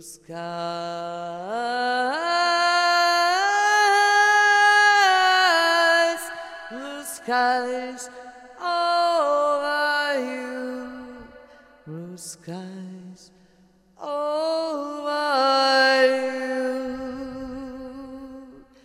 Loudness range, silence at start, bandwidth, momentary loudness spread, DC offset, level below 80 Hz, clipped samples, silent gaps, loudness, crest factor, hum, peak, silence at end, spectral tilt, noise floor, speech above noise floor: 15 LU; 0 s; 16 kHz; 21 LU; under 0.1%; -62 dBFS; under 0.1%; none; -20 LUFS; 16 dB; none; -8 dBFS; 0.25 s; -2 dB/octave; -58 dBFS; 29 dB